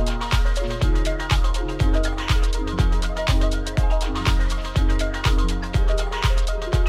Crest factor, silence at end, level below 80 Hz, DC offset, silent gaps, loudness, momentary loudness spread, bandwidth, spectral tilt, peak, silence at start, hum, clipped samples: 12 dB; 0 s; -20 dBFS; under 0.1%; none; -23 LUFS; 2 LU; 12 kHz; -5.5 dB/octave; -8 dBFS; 0 s; none; under 0.1%